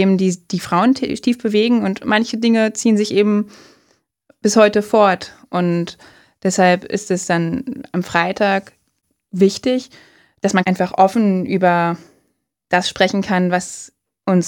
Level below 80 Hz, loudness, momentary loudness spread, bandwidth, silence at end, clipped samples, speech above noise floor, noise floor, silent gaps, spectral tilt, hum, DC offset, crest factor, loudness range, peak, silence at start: -58 dBFS; -17 LUFS; 10 LU; 16 kHz; 0 s; under 0.1%; 52 dB; -68 dBFS; none; -5.5 dB/octave; none; under 0.1%; 18 dB; 3 LU; 0 dBFS; 0 s